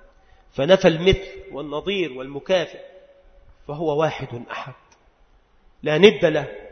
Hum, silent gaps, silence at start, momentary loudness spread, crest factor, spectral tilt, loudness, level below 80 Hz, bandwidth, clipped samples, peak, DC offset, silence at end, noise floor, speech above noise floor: none; none; 0.55 s; 19 LU; 22 dB; -5.5 dB/octave; -20 LUFS; -44 dBFS; 6.6 kHz; under 0.1%; 0 dBFS; under 0.1%; 0 s; -56 dBFS; 36 dB